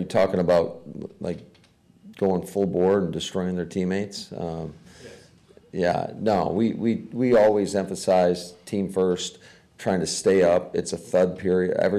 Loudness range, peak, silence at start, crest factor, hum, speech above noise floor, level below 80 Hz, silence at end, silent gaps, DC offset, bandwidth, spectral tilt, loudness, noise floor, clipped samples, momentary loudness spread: 5 LU; -12 dBFS; 0 s; 12 dB; none; 34 dB; -56 dBFS; 0 s; none; under 0.1%; 14 kHz; -5.5 dB/octave; -24 LUFS; -57 dBFS; under 0.1%; 13 LU